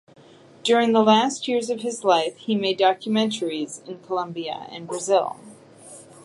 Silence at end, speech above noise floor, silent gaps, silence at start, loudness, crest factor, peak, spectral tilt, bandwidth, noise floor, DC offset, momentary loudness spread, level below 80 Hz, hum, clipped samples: 0.25 s; 23 dB; none; 0.65 s; -22 LUFS; 20 dB; -4 dBFS; -4 dB/octave; 11.5 kHz; -45 dBFS; under 0.1%; 15 LU; -78 dBFS; none; under 0.1%